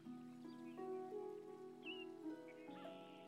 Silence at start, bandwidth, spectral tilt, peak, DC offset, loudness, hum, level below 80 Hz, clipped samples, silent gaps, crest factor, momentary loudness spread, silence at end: 0 s; 15.5 kHz; -5.5 dB/octave; -40 dBFS; under 0.1%; -53 LUFS; none; under -90 dBFS; under 0.1%; none; 12 dB; 6 LU; 0 s